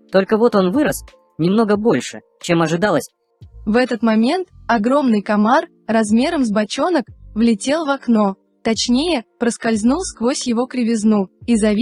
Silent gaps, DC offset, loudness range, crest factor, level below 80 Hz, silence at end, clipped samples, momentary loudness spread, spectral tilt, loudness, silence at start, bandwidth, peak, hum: none; under 0.1%; 2 LU; 16 dB; -46 dBFS; 0 s; under 0.1%; 6 LU; -5 dB/octave; -17 LUFS; 0.1 s; 13 kHz; -2 dBFS; none